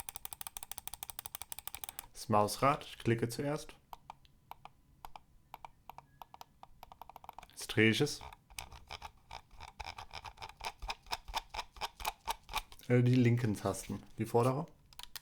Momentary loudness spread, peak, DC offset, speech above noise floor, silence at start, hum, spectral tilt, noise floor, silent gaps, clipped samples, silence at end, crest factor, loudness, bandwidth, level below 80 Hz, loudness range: 25 LU; -14 dBFS; under 0.1%; 28 dB; 0.1 s; none; -5.5 dB/octave; -60 dBFS; none; under 0.1%; 0.05 s; 24 dB; -36 LUFS; over 20 kHz; -58 dBFS; 15 LU